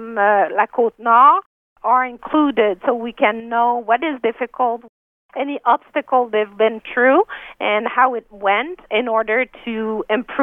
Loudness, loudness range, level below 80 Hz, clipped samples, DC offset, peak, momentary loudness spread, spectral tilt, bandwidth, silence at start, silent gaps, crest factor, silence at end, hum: -18 LUFS; 4 LU; -60 dBFS; under 0.1%; under 0.1%; 0 dBFS; 9 LU; -7 dB/octave; 3.8 kHz; 0 s; 1.46-1.76 s, 4.89-5.29 s; 18 dB; 0 s; none